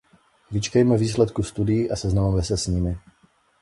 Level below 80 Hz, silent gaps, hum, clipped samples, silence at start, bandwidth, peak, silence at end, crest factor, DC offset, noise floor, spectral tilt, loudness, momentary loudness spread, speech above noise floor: -36 dBFS; none; none; under 0.1%; 0.5 s; 11.5 kHz; -6 dBFS; 0.65 s; 18 dB; under 0.1%; -61 dBFS; -6.5 dB/octave; -23 LUFS; 9 LU; 40 dB